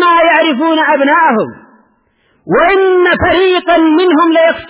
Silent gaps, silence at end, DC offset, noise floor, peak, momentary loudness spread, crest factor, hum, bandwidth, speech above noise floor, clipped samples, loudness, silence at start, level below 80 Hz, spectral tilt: none; 0 s; under 0.1%; -55 dBFS; 0 dBFS; 3 LU; 10 dB; none; 4 kHz; 46 dB; under 0.1%; -9 LUFS; 0 s; -38 dBFS; -8.5 dB/octave